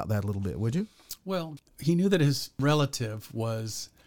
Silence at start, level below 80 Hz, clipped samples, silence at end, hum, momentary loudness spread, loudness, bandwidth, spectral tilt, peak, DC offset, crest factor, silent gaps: 0 s; -56 dBFS; under 0.1%; 0.2 s; none; 11 LU; -29 LUFS; 19 kHz; -6 dB/octave; -10 dBFS; under 0.1%; 20 dB; none